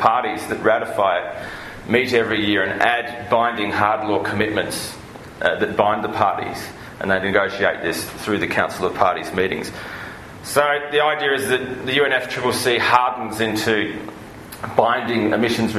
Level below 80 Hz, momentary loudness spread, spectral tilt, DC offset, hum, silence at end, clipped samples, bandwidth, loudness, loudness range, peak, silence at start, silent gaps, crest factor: -52 dBFS; 14 LU; -4 dB/octave; under 0.1%; none; 0 s; under 0.1%; 13.5 kHz; -20 LUFS; 3 LU; 0 dBFS; 0 s; none; 20 dB